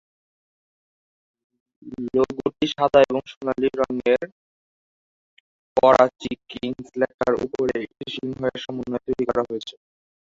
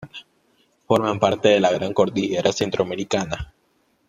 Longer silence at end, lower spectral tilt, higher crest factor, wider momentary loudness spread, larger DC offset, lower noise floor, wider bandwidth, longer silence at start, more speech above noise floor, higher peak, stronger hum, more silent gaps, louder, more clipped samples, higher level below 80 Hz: about the same, 0.55 s vs 0.65 s; about the same, -6 dB/octave vs -5 dB/octave; about the same, 22 dB vs 20 dB; about the same, 15 LU vs 15 LU; neither; first, under -90 dBFS vs -65 dBFS; second, 7.8 kHz vs 14 kHz; first, 1.85 s vs 0 s; first, over 68 dB vs 45 dB; about the same, -2 dBFS vs -2 dBFS; neither; first, 3.37-3.41 s, 4.32-5.76 s, 7.14-7.18 s vs none; about the same, -23 LUFS vs -21 LUFS; neither; second, -56 dBFS vs -48 dBFS